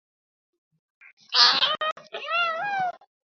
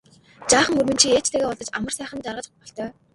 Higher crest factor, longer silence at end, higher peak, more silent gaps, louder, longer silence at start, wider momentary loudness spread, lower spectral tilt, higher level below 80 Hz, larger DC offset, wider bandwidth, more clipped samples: about the same, 26 dB vs 22 dB; about the same, 0.3 s vs 0.25 s; about the same, 0 dBFS vs 0 dBFS; first, 1.92-1.96 s vs none; about the same, -22 LUFS vs -20 LUFS; first, 1.3 s vs 0.4 s; second, 13 LU vs 17 LU; second, 0 dB/octave vs -2 dB/octave; second, -82 dBFS vs -54 dBFS; neither; second, 7.6 kHz vs 12 kHz; neither